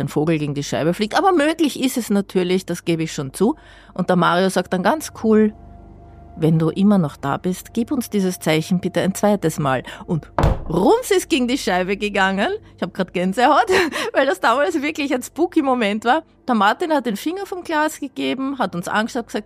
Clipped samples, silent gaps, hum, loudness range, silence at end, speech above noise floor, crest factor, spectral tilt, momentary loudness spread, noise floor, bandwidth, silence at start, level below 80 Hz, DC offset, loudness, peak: under 0.1%; none; none; 2 LU; 0.05 s; 22 dB; 16 dB; -5.5 dB/octave; 8 LU; -41 dBFS; 15.5 kHz; 0 s; -38 dBFS; under 0.1%; -19 LUFS; -4 dBFS